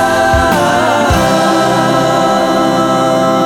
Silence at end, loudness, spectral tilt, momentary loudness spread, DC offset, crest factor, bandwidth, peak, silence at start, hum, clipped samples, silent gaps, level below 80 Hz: 0 s; -11 LUFS; -5 dB/octave; 1 LU; under 0.1%; 10 dB; 19.5 kHz; 0 dBFS; 0 s; none; under 0.1%; none; -28 dBFS